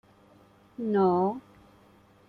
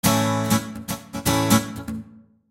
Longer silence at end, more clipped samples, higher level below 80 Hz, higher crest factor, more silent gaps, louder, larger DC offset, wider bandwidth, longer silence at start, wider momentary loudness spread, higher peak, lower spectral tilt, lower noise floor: first, 0.9 s vs 0.3 s; neither; second, -68 dBFS vs -46 dBFS; about the same, 16 dB vs 20 dB; neither; second, -27 LUFS vs -22 LUFS; neither; second, 4.7 kHz vs 17 kHz; first, 0.8 s vs 0.05 s; first, 19 LU vs 14 LU; second, -14 dBFS vs -4 dBFS; first, -10 dB/octave vs -4.5 dB/octave; first, -58 dBFS vs -46 dBFS